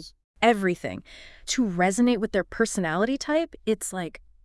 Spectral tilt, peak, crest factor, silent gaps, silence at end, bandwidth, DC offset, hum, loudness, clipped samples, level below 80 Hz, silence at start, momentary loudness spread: -4.5 dB/octave; -6 dBFS; 20 dB; 0.24-0.34 s; 0.3 s; 12 kHz; under 0.1%; none; -25 LUFS; under 0.1%; -52 dBFS; 0 s; 13 LU